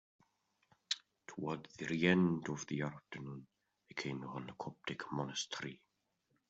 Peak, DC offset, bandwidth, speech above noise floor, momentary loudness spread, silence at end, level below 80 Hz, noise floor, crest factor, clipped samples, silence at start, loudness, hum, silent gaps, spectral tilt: -16 dBFS; under 0.1%; 8.2 kHz; 43 dB; 16 LU; 0.75 s; -76 dBFS; -82 dBFS; 24 dB; under 0.1%; 0.9 s; -40 LUFS; none; none; -5 dB/octave